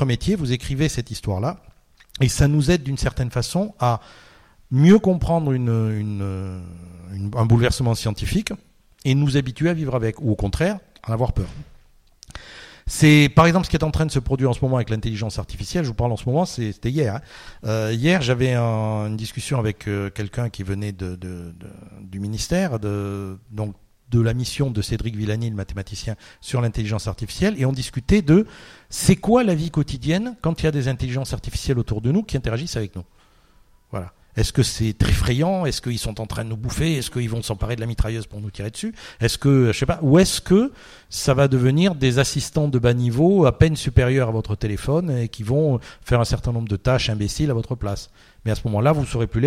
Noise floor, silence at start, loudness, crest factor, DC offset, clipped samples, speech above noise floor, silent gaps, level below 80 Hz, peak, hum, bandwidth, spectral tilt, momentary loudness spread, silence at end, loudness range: -54 dBFS; 0 s; -21 LUFS; 20 dB; under 0.1%; under 0.1%; 33 dB; none; -36 dBFS; -2 dBFS; none; 15 kHz; -6 dB/octave; 14 LU; 0 s; 7 LU